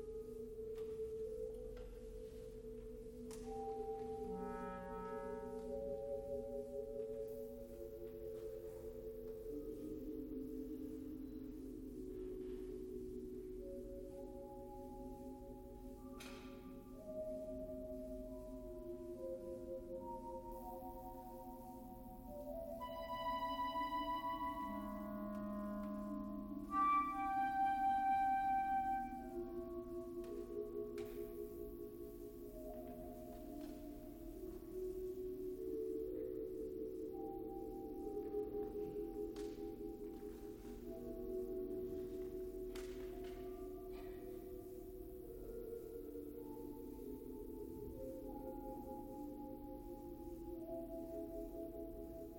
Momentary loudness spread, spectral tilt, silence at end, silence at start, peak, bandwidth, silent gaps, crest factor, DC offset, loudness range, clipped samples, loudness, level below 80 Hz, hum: 11 LU; -6.5 dB/octave; 0 s; 0 s; -28 dBFS; 17 kHz; none; 18 dB; under 0.1%; 11 LU; under 0.1%; -47 LUFS; -60 dBFS; none